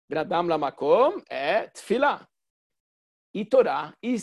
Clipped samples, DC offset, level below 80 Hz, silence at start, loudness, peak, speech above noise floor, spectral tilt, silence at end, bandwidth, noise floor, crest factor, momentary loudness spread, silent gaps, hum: under 0.1%; under 0.1%; -68 dBFS; 0.1 s; -24 LUFS; -8 dBFS; over 66 dB; -5.5 dB/octave; 0 s; 12 kHz; under -90 dBFS; 18 dB; 9 LU; 2.50-2.70 s, 2.80-3.34 s; none